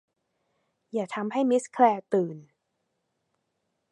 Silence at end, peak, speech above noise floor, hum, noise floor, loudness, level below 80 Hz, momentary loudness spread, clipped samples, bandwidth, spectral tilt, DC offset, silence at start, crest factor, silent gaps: 1.5 s; -6 dBFS; 53 dB; none; -79 dBFS; -26 LUFS; -88 dBFS; 13 LU; under 0.1%; 11 kHz; -6 dB/octave; under 0.1%; 0.95 s; 22 dB; none